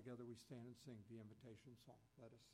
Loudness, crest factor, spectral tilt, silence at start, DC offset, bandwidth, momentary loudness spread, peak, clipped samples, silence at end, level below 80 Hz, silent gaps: -61 LUFS; 16 dB; -6.5 dB/octave; 0 s; under 0.1%; 16 kHz; 9 LU; -44 dBFS; under 0.1%; 0 s; -86 dBFS; none